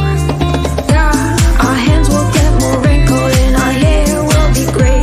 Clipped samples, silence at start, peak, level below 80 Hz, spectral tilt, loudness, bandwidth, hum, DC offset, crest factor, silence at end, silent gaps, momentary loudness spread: under 0.1%; 0 s; 0 dBFS; -14 dBFS; -5.5 dB/octave; -11 LUFS; 15.5 kHz; none; under 0.1%; 10 dB; 0 s; none; 3 LU